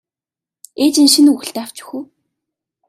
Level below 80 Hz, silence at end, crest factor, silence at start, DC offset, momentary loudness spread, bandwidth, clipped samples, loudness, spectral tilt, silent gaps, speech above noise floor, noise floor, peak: -66 dBFS; 0.85 s; 16 dB; 0.8 s; under 0.1%; 20 LU; 15 kHz; under 0.1%; -12 LUFS; -1.5 dB/octave; none; 76 dB; -89 dBFS; 0 dBFS